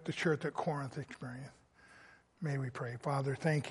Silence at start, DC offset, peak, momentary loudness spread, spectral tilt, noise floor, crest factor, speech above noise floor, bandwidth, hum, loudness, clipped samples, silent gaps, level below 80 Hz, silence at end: 0 s; under 0.1%; -18 dBFS; 13 LU; -6.5 dB/octave; -62 dBFS; 20 dB; 25 dB; 11.5 kHz; none; -38 LUFS; under 0.1%; none; -74 dBFS; 0 s